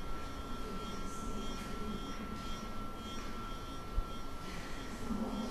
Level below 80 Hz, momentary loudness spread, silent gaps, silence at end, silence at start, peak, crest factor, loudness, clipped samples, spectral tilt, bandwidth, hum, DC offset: -44 dBFS; 4 LU; none; 0 s; 0 s; -22 dBFS; 18 dB; -43 LUFS; under 0.1%; -5 dB/octave; 13 kHz; none; under 0.1%